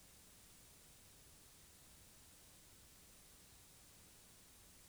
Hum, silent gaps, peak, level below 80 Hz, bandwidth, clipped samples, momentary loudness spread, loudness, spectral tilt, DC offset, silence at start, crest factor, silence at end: none; none; -50 dBFS; -74 dBFS; over 20 kHz; under 0.1%; 0 LU; -61 LUFS; -2 dB/octave; under 0.1%; 0 s; 14 dB; 0 s